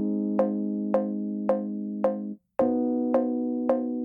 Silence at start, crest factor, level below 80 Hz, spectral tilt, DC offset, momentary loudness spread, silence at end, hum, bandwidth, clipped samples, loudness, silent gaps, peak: 0 s; 16 dB; -68 dBFS; -11 dB/octave; under 0.1%; 5 LU; 0 s; none; 3.3 kHz; under 0.1%; -27 LUFS; none; -12 dBFS